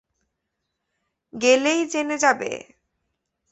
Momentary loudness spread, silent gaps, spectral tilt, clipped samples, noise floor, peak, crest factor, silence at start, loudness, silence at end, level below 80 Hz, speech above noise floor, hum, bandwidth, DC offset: 15 LU; none; -2 dB/octave; under 0.1%; -79 dBFS; -4 dBFS; 22 dB; 1.35 s; -21 LUFS; 0.95 s; -70 dBFS; 58 dB; none; 8.4 kHz; under 0.1%